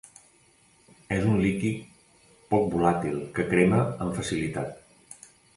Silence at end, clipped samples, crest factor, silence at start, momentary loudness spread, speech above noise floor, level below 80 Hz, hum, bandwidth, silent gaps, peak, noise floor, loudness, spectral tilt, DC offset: 0.4 s; under 0.1%; 20 dB; 1.1 s; 15 LU; 36 dB; -52 dBFS; none; 11.5 kHz; none; -8 dBFS; -61 dBFS; -26 LUFS; -6.5 dB/octave; under 0.1%